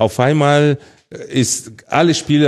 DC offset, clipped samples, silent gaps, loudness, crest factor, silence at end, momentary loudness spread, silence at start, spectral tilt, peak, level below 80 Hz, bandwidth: under 0.1%; under 0.1%; none; -15 LUFS; 14 dB; 0 s; 10 LU; 0 s; -5 dB/octave; 0 dBFS; -52 dBFS; 12.5 kHz